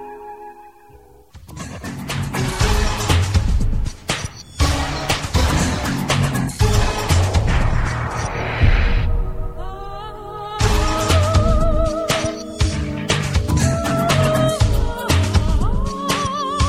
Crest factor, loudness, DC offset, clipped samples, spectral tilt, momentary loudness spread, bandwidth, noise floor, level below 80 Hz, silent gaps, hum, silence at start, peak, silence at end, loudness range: 16 dB; -19 LUFS; 0.2%; under 0.1%; -5 dB/octave; 14 LU; 16 kHz; -46 dBFS; -22 dBFS; none; none; 0 s; -2 dBFS; 0 s; 3 LU